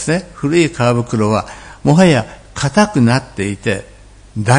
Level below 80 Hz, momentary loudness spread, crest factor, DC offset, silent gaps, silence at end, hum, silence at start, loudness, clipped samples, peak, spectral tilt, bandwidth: -40 dBFS; 11 LU; 14 dB; under 0.1%; none; 0 s; none; 0 s; -15 LUFS; 0.1%; 0 dBFS; -6 dB/octave; 10.5 kHz